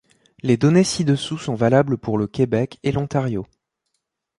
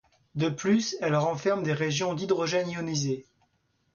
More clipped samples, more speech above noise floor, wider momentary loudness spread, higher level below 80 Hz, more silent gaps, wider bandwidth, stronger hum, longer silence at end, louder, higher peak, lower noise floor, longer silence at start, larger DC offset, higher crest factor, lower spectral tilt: neither; first, 57 dB vs 45 dB; first, 9 LU vs 5 LU; first, -50 dBFS vs -66 dBFS; neither; first, 11.5 kHz vs 7.2 kHz; neither; first, 0.95 s vs 0.7 s; first, -20 LUFS vs -28 LUFS; first, -4 dBFS vs -14 dBFS; first, -76 dBFS vs -72 dBFS; about the same, 0.45 s vs 0.35 s; neither; about the same, 18 dB vs 16 dB; first, -6.5 dB/octave vs -5 dB/octave